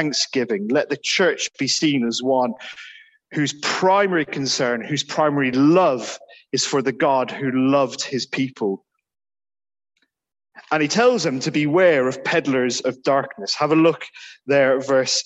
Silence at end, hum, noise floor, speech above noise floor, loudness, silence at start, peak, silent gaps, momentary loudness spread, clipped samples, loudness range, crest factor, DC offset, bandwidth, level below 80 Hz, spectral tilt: 0.05 s; none; under -90 dBFS; over 70 dB; -20 LUFS; 0 s; -4 dBFS; none; 10 LU; under 0.1%; 4 LU; 16 dB; under 0.1%; 8.6 kHz; -68 dBFS; -4 dB/octave